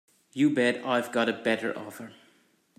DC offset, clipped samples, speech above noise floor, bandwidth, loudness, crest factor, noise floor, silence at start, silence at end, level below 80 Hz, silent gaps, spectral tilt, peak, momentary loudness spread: under 0.1%; under 0.1%; 38 dB; 15 kHz; -27 LUFS; 16 dB; -65 dBFS; 0.35 s; 0.65 s; -76 dBFS; none; -5 dB/octave; -12 dBFS; 18 LU